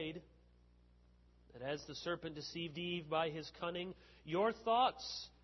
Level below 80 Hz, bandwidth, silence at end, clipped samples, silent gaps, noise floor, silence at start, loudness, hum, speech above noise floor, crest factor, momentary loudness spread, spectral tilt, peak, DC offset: -68 dBFS; 6.2 kHz; 0.15 s; under 0.1%; none; -67 dBFS; 0 s; -40 LUFS; 60 Hz at -70 dBFS; 27 dB; 20 dB; 13 LU; -3 dB/octave; -22 dBFS; under 0.1%